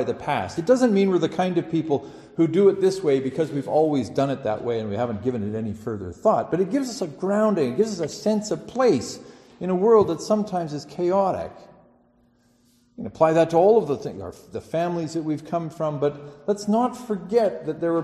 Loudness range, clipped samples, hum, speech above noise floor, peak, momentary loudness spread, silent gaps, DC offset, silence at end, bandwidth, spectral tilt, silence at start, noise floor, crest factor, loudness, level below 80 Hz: 4 LU; under 0.1%; none; 38 dB; -6 dBFS; 12 LU; none; under 0.1%; 0 s; 12.5 kHz; -6.5 dB/octave; 0 s; -61 dBFS; 18 dB; -23 LUFS; -60 dBFS